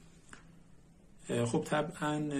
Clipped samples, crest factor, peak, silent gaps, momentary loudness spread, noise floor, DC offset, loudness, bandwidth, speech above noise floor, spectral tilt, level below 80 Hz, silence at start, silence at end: under 0.1%; 18 dB; -18 dBFS; none; 23 LU; -59 dBFS; under 0.1%; -34 LUFS; 13 kHz; 25 dB; -5.5 dB/octave; -64 dBFS; 0 s; 0 s